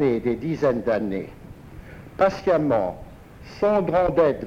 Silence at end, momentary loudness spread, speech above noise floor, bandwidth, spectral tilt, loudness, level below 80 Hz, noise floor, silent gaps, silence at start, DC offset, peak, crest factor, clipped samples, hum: 0 s; 23 LU; 20 dB; 10 kHz; -8 dB/octave; -22 LUFS; -46 dBFS; -41 dBFS; none; 0 s; under 0.1%; -8 dBFS; 16 dB; under 0.1%; none